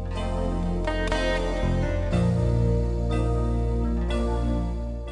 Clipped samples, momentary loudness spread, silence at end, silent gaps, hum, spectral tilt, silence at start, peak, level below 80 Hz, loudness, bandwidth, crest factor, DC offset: under 0.1%; 5 LU; 0 s; none; none; -7 dB/octave; 0 s; -10 dBFS; -28 dBFS; -26 LUFS; 10.5 kHz; 14 dB; under 0.1%